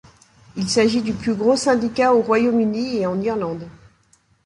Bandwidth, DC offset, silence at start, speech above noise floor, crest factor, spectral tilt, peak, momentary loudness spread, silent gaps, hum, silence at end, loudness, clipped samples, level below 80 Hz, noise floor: 11 kHz; under 0.1%; 0.55 s; 40 dB; 16 dB; -5 dB/octave; -4 dBFS; 11 LU; none; none; 0.75 s; -19 LUFS; under 0.1%; -52 dBFS; -59 dBFS